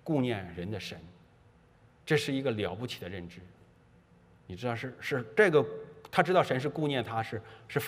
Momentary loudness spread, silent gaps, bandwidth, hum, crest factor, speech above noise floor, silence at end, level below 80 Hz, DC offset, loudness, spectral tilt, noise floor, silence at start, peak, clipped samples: 17 LU; none; 15.5 kHz; none; 24 dB; 30 dB; 0 s; -68 dBFS; under 0.1%; -31 LUFS; -6 dB/octave; -61 dBFS; 0.05 s; -8 dBFS; under 0.1%